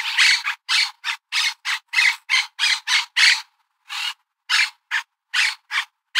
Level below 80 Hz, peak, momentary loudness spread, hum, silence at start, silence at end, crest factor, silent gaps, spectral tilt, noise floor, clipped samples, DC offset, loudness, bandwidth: under -90 dBFS; -2 dBFS; 12 LU; none; 0 s; 0 s; 20 dB; none; 12.5 dB/octave; -48 dBFS; under 0.1%; under 0.1%; -19 LUFS; 16 kHz